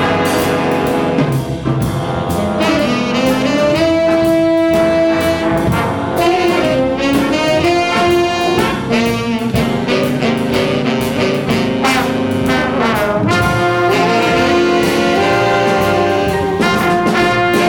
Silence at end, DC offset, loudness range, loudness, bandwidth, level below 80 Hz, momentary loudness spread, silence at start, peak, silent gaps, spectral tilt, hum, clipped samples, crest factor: 0 s; under 0.1%; 2 LU; -14 LUFS; 18 kHz; -36 dBFS; 4 LU; 0 s; -2 dBFS; none; -5.5 dB/octave; none; under 0.1%; 12 dB